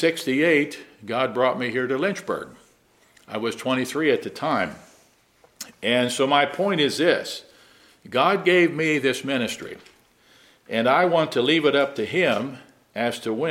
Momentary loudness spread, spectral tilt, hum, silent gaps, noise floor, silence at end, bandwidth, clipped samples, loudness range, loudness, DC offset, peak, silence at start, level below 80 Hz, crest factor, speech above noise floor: 15 LU; -4.5 dB/octave; none; none; -59 dBFS; 0 s; 16 kHz; under 0.1%; 5 LU; -22 LUFS; under 0.1%; -4 dBFS; 0 s; -68 dBFS; 20 dB; 37 dB